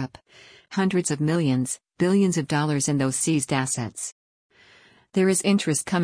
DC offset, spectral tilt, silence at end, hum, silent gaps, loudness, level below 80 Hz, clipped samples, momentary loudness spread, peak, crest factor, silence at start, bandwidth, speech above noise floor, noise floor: under 0.1%; -5 dB/octave; 0 s; none; 4.12-4.50 s; -23 LUFS; -62 dBFS; under 0.1%; 10 LU; -8 dBFS; 16 dB; 0 s; 10.5 kHz; 32 dB; -55 dBFS